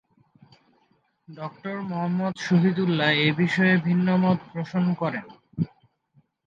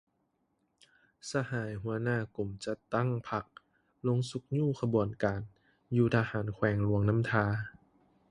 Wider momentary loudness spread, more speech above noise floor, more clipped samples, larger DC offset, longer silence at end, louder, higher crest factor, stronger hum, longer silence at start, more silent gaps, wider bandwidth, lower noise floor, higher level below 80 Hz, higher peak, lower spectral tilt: first, 14 LU vs 10 LU; about the same, 44 dB vs 46 dB; neither; neither; first, 0.8 s vs 0.6 s; first, -24 LUFS vs -32 LUFS; about the same, 18 dB vs 22 dB; neither; about the same, 1.3 s vs 1.25 s; neither; second, 7.4 kHz vs 11 kHz; second, -67 dBFS vs -77 dBFS; second, -68 dBFS vs -58 dBFS; first, -6 dBFS vs -12 dBFS; about the same, -7 dB/octave vs -7.5 dB/octave